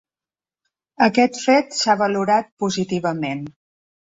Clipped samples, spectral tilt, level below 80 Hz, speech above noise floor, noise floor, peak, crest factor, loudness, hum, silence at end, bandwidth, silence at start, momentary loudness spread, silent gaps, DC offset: under 0.1%; -4.5 dB/octave; -62 dBFS; over 71 dB; under -90 dBFS; -2 dBFS; 18 dB; -19 LUFS; none; 0.65 s; 8 kHz; 1 s; 10 LU; 2.52-2.57 s; under 0.1%